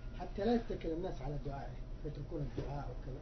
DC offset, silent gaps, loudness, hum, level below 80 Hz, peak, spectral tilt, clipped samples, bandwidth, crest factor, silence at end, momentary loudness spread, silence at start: under 0.1%; none; -41 LUFS; none; -46 dBFS; -22 dBFS; -7 dB/octave; under 0.1%; 6.2 kHz; 18 dB; 0 s; 11 LU; 0 s